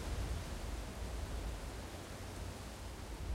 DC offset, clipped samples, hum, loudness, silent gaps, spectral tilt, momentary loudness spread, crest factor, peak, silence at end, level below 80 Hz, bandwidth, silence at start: under 0.1%; under 0.1%; none; -46 LUFS; none; -5 dB/octave; 5 LU; 14 dB; -30 dBFS; 0 s; -46 dBFS; 16 kHz; 0 s